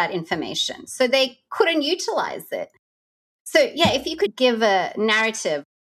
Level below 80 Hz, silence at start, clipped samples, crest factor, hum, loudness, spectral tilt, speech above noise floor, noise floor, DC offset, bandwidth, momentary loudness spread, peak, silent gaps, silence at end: -60 dBFS; 0 s; under 0.1%; 20 dB; none; -21 LUFS; -3 dB/octave; over 69 dB; under -90 dBFS; under 0.1%; 14.5 kHz; 11 LU; -2 dBFS; 2.79-3.45 s; 0.3 s